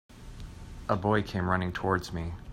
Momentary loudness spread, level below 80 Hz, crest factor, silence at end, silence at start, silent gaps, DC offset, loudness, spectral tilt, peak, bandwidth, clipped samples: 19 LU; -48 dBFS; 20 dB; 0 s; 0.1 s; none; under 0.1%; -30 LUFS; -6.5 dB/octave; -12 dBFS; 16 kHz; under 0.1%